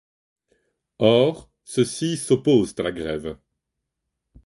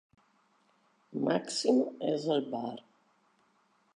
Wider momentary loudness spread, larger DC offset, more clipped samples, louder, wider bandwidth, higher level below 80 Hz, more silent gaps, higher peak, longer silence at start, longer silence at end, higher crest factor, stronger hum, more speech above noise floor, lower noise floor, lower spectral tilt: about the same, 15 LU vs 13 LU; neither; neither; first, -22 LUFS vs -32 LUFS; about the same, 11.5 kHz vs 11 kHz; first, -54 dBFS vs -88 dBFS; neither; first, -4 dBFS vs -14 dBFS; about the same, 1 s vs 1.1 s; about the same, 1.1 s vs 1.15 s; about the same, 20 dB vs 20 dB; neither; first, 60 dB vs 40 dB; first, -81 dBFS vs -71 dBFS; about the same, -5.5 dB/octave vs -5 dB/octave